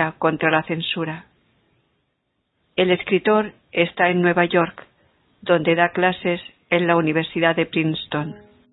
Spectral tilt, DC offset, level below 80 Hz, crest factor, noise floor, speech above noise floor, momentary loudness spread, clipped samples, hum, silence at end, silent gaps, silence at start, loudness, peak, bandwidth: -11 dB/octave; under 0.1%; -60 dBFS; 20 dB; -72 dBFS; 53 dB; 10 LU; under 0.1%; none; 0.35 s; none; 0 s; -20 LUFS; -2 dBFS; 4.1 kHz